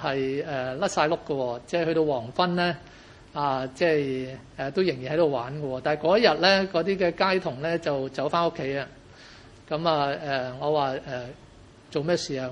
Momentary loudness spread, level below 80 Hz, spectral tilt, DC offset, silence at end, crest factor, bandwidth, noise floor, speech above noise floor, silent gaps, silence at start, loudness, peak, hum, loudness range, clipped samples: 11 LU; -58 dBFS; -5 dB/octave; under 0.1%; 0 s; 22 dB; 11 kHz; -50 dBFS; 24 dB; none; 0 s; -26 LUFS; -4 dBFS; none; 5 LU; under 0.1%